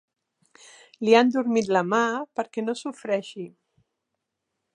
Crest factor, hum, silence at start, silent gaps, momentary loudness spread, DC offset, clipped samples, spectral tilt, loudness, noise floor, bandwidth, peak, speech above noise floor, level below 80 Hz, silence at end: 22 dB; none; 1 s; none; 15 LU; under 0.1%; under 0.1%; -5 dB/octave; -24 LUFS; -82 dBFS; 10.5 kHz; -4 dBFS; 58 dB; -76 dBFS; 1.25 s